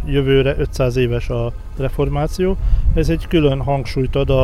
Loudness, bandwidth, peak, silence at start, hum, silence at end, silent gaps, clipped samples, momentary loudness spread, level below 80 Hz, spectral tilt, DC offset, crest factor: -18 LUFS; 13.5 kHz; -2 dBFS; 0 s; none; 0 s; none; under 0.1%; 7 LU; -22 dBFS; -7.5 dB/octave; under 0.1%; 14 dB